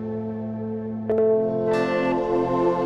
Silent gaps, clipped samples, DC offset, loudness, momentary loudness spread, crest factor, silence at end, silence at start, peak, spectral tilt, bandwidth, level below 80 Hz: none; under 0.1%; under 0.1%; -23 LUFS; 9 LU; 12 dB; 0 s; 0 s; -10 dBFS; -8 dB/octave; 8.4 kHz; -52 dBFS